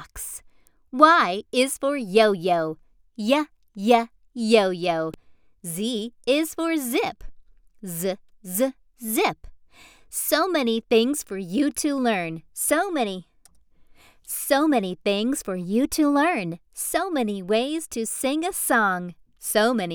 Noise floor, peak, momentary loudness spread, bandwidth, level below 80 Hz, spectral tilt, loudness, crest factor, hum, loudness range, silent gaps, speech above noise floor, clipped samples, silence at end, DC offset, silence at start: -56 dBFS; -2 dBFS; 14 LU; over 20 kHz; -56 dBFS; -3.5 dB/octave; -23 LUFS; 22 dB; none; 5 LU; none; 34 dB; under 0.1%; 0 s; under 0.1%; 0 s